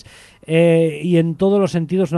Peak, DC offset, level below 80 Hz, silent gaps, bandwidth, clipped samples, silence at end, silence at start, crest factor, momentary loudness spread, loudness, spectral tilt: -4 dBFS; under 0.1%; -54 dBFS; none; 11.5 kHz; under 0.1%; 0 s; 0.5 s; 14 dB; 5 LU; -16 LUFS; -7.5 dB/octave